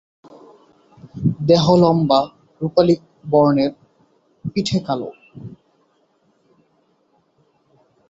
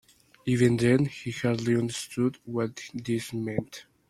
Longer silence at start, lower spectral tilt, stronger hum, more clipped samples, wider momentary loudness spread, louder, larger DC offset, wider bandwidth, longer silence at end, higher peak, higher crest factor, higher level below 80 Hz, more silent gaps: first, 1.05 s vs 0.45 s; about the same, -7 dB/octave vs -6 dB/octave; neither; neither; first, 24 LU vs 11 LU; first, -18 LUFS vs -28 LUFS; neither; second, 8 kHz vs 14 kHz; first, 2.6 s vs 0.3 s; first, -2 dBFS vs -10 dBFS; about the same, 20 dB vs 18 dB; first, -54 dBFS vs -60 dBFS; neither